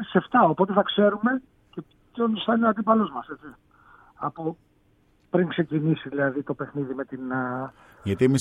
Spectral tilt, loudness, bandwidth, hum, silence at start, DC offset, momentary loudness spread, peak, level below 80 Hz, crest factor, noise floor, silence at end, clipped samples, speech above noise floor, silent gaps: -7 dB/octave; -25 LUFS; 8.6 kHz; none; 0 s; under 0.1%; 18 LU; -4 dBFS; -64 dBFS; 20 dB; -62 dBFS; 0 s; under 0.1%; 38 dB; none